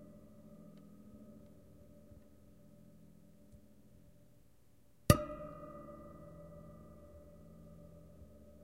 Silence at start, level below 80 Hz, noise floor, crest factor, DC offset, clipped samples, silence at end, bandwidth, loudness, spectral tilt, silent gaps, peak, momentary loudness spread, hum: 0 s; -54 dBFS; -69 dBFS; 36 dB; under 0.1%; under 0.1%; 0 s; 16 kHz; -37 LUFS; -5.5 dB/octave; none; -8 dBFS; 23 LU; none